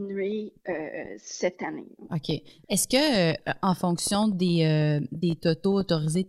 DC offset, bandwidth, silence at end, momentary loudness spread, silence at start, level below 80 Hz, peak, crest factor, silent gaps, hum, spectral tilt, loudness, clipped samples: under 0.1%; 15 kHz; 0 s; 12 LU; 0 s; -58 dBFS; -10 dBFS; 16 dB; none; none; -5 dB/octave; -26 LUFS; under 0.1%